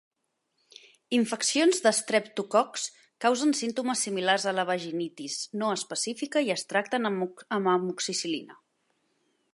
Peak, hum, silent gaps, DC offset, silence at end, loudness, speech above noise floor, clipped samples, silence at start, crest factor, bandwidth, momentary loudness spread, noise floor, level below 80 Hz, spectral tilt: -8 dBFS; none; none; under 0.1%; 1 s; -28 LUFS; 50 dB; under 0.1%; 1.1 s; 20 dB; 11.5 kHz; 10 LU; -77 dBFS; -84 dBFS; -3 dB/octave